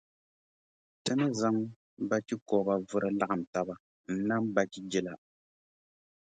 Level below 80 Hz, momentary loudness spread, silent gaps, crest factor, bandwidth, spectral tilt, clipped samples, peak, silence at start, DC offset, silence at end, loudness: -72 dBFS; 10 LU; 1.76-1.97 s, 2.42-2.46 s, 3.47-3.53 s, 3.80-4.04 s; 22 dB; 9.4 kHz; -5.5 dB/octave; under 0.1%; -12 dBFS; 1.05 s; under 0.1%; 1.15 s; -32 LUFS